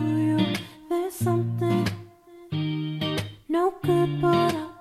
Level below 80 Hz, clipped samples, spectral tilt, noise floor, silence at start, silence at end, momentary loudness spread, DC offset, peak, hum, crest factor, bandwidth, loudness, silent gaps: -56 dBFS; under 0.1%; -6.5 dB/octave; -48 dBFS; 0 s; 0 s; 8 LU; under 0.1%; -10 dBFS; none; 16 dB; 15 kHz; -26 LUFS; none